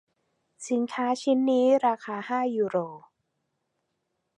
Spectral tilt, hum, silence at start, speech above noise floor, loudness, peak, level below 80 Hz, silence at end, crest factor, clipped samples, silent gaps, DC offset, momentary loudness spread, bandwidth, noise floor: -5 dB/octave; none; 0.6 s; 54 dB; -26 LUFS; -12 dBFS; -84 dBFS; 1.4 s; 16 dB; under 0.1%; none; under 0.1%; 10 LU; 10.5 kHz; -79 dBFS